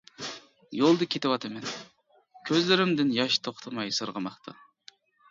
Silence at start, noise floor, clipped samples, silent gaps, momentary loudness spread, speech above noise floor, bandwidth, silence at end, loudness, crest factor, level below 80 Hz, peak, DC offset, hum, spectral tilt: 0.2 s; -62 dBFS; under 0.1%; none; 18 LU; 35 dB; 7.6 kHz; 0.8 s; -27 LUFS; 22 dB; -74 dBFS; -6 dBFS; under 0.1%; none; -4.5 dB/octave